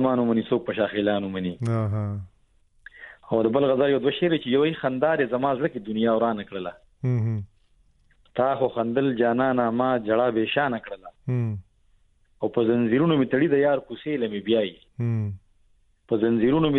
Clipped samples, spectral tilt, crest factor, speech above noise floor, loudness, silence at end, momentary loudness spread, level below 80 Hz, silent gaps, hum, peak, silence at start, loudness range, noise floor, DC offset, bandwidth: under 0.1%; -9 dB/octave; 16 dB; 38 dB; -24 LUFS; 0 s; 12 LU; -58 dBFS; none; none; -8 dBFS; 0 s; 3 LU; -61 dBFS; under 0.1%; 5.8 kHz